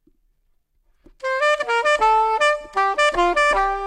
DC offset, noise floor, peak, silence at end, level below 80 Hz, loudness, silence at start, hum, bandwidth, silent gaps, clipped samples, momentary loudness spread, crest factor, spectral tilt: under 0.1%; -64 dBFS; -6 dBFS; 0 s; -44 dBFS; -18 LUFS; 1.25 s; none; 11.5 kHz; none; under 0.1%; 5 LU; 14 dB; -2 dB/octave